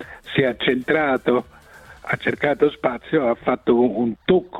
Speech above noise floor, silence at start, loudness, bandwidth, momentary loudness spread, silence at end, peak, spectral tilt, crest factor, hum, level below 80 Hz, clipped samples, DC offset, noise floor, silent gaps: 25 dB; 0 s; -20 LUFS; 9.6 kHz; 6 LU; 0 s; -4 dBFS; -7.5 dB/octave; 16 dB; none; -52 dBFS; under 0.1%; under 0.1%; -45 dBFS; none